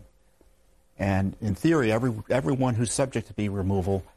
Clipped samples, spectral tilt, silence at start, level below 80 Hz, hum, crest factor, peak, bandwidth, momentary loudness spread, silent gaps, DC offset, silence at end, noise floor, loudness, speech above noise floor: under 0.1%; -6 dB/octave; 0 s; -50 dBFS; none; 18 dB; -10 dBFS; 13 kHz; 6 LU; none; under 0.1%; 0.15 s; -62 dBFS; -26 LUFS; 37 dB